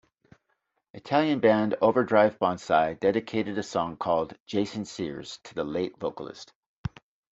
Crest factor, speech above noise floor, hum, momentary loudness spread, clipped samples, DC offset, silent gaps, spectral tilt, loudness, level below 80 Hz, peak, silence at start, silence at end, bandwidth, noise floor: 22 dB; 50 dB; none; 17 LU; under 0.1%; under 0.1%; 4.40-4.46 s, 6.55-6.84 s; -6 dB/octave; -26 LUFS; -60 dBFS; -6 dBFS; 0.95 s; 0.45 s; 8 kHz; -76 dBFS